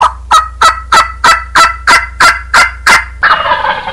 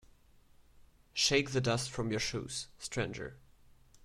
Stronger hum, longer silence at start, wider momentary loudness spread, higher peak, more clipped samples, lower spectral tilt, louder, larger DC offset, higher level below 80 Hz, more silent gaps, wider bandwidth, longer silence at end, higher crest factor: neither; about the same, 0 s vs 0.05 s; second, 3 LU vs 12 LU; first, 0 dBFS vs -16 dBFS; first, 0.2% vs under 0.1%; second, -1 dB/octave vs -3.5 dB/octave; first, -7 LUFS vs -34 LUFS; first, 0.6% vs under 0.1%; first, -28 dBFS vs -58 dBFS; neither; about the same, 16.5 kHz vs 15.5 kHz; about the same, 0 s vs 0.05 s; second, 8 dB vs 22 dB